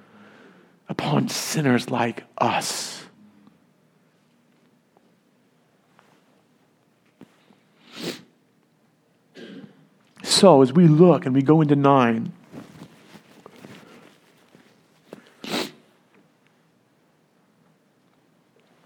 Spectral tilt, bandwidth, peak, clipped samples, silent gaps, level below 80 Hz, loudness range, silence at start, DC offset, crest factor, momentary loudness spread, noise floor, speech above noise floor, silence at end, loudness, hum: -5.5 dB/octave; 18.5 kHz; 0 dBFS; under 0.1%; none; -74 dBFS; 24 LU; 0.9 s; under 0.1%; 24 dB; 28 LU; -63 dBFS; 45 dB; 3.15 s; -19 LUFS; none